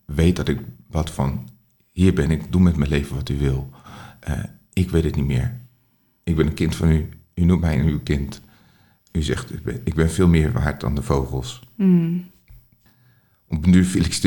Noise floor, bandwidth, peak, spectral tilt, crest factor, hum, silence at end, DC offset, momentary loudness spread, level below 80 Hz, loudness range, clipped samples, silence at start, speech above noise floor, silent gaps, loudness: -62 dBFS; 17.5 kHz; -2 dBFS; -7 dB/octave; 18 dB; none; 0 s; under 0.1%; 13 LU; -34 dBFS; 3 LU; under 0.1%; 0.1 s; 43 dB; none; -21 LUFS